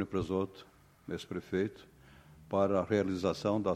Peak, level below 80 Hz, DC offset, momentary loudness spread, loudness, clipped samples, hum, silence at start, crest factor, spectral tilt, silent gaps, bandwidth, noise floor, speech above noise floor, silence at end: -16 dBFS; -62 dBFS; under 0.1%; 12 LU; -34 LUFS; under 0.1%; none; 0 s; 18 dB; -7 dB/octave; none; 15 kHz; -57 dBFS; 24 dB; 0 s